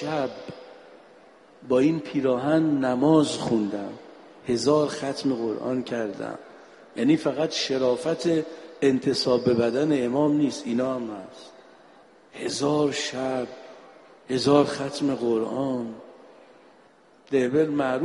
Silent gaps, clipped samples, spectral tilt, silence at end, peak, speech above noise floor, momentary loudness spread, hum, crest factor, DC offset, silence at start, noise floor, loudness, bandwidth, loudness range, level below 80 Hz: none; under 0.1%; -5.5 dB/octave; 0 s; -6 dBFS; 32 dB; 15 LU; none; 18 dB; under 0.1%; 0 s; -56 dBFS; -24 LUFS; 11.5 kHz; 4 LU; -64 dBFS